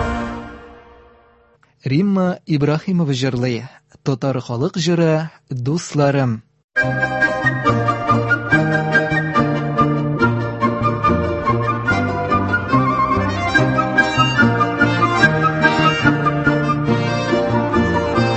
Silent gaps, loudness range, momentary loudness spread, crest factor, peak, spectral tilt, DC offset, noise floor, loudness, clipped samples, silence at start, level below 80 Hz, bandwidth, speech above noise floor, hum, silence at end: 6.64-6.68 s; 5 LU; 7 LU; 18 dB; 0 dBFS; -6.5 dB/octave; under 0.1%; -54 dBFS; -17 LUFS; under 0.1%; 0 s; -38 dBFS; 8.4 kHz; 36 dB; none; 0 s